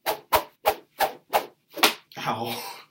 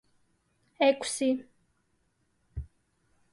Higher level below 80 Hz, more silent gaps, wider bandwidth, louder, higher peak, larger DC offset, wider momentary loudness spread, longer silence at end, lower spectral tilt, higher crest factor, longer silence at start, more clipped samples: about the same, -58 dBFS vs -54 dBFS; neither; first, 16.5 kHz vs 11.5 kHz; about the same, -26 LUFS vs -28 LUFS; first, 0 dBFS vs -12 dBFS; neither; second, 10 LU vs 19 LU; second, 0.1 s vs 0.7 s; second, -2 dB/octave vs -4 dB/octave; first, 28 dB vs 22 dB; second, 0.05 s vs 0.8 s; neither